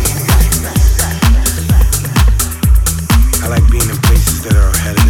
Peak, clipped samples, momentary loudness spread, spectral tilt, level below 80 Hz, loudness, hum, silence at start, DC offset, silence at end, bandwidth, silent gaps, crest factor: 0 dBFS; under 0.1%; 2 LU; -4.5 dB/octave; -12 dBFS; -12 LUFS; none; 0 s; under 0.1%; 0 s; 17.5 kHz; none; 10 dB